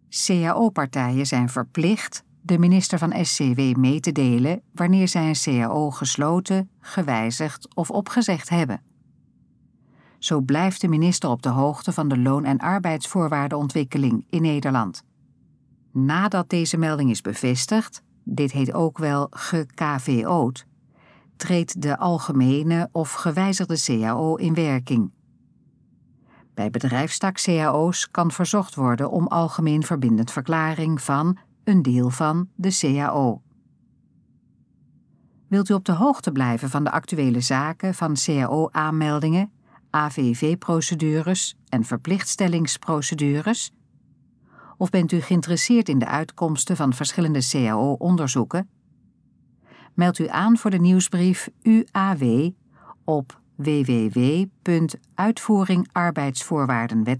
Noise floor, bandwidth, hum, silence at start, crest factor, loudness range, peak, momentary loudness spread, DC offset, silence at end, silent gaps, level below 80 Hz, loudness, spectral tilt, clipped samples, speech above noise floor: -59 dBFS; 11 kHz; none; 0.1 s; 16 dB; 4 LU; -6 dBFS; 6 LU; under 0.1%; 0 s; none; -70 dBFS; -22 LUFS; -5.5 dB/octave; under 0.1%; 38 dB